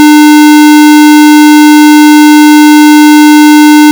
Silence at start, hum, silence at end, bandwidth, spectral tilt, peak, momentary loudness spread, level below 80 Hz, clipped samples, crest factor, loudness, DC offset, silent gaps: 0 s; none; 0 s; over 20 kHz; -1 dB/octave; 0 dBFS; 0 LU; -62 dBFS; 50%; 0 dB; -1 LUFS; 0.8%; none